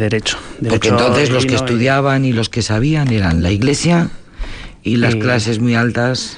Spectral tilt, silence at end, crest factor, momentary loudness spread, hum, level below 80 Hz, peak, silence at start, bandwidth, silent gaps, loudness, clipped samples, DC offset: -5.5 dB/octave; 0 s; 12 dB; 9 LU; none; -36 dBFS; -2 dBFS; 0 s; 10.5 kHz; none; -15 LUFS; under 0.1%; under 0.1%